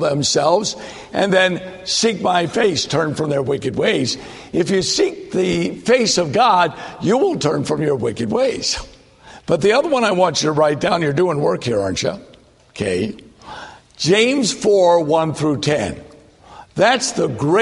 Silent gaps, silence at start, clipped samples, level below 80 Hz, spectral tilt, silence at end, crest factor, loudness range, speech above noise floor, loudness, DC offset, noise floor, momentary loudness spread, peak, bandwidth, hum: none; 0 s; under 0.1%; -50 dBFS; -4 dB/octave; 0 s; 16 dB; 3 LU; 26 dB; -17 LUFS; under 0.1%; -43 dBFS; 11 LU; -2 dBFS; 11.5 kHz; none